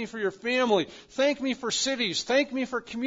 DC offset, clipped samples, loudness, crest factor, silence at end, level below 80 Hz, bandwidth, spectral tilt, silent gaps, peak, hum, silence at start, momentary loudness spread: under 0.1%; under 0.1%; -27 LUFS; 18 dB; 0 s; -64 dBFS; 7.8 kHz; -2.5 dB/octave; none; -10 dBFS; none; 0 s; 7 LU